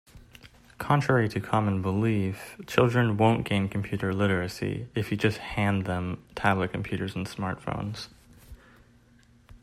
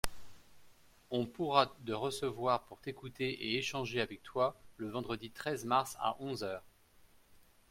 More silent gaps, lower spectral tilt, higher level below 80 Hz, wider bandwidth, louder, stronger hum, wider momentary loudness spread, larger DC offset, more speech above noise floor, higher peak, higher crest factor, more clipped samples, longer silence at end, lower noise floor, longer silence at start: neither; first, -7 dB/octave vs -4.5 dB/octave; about the same, -54 dBFS vs -58 dBFS; second, 14.5 kHz vs 16.5 kHz; first, -27 LUFS vs -37 LUFS; neither; about the same, 10 LU vs 11 LU; neither; first, 32 dB vs 28 dB; first, -6 dBFS vs -12 dBFS; about the same, 22 dB vs 26 dB; neither; second, 0.05 s vs 0.3 s; second, -58 dBFS vs -64 dBFS; about the same, 0.15 s vs 0.05 s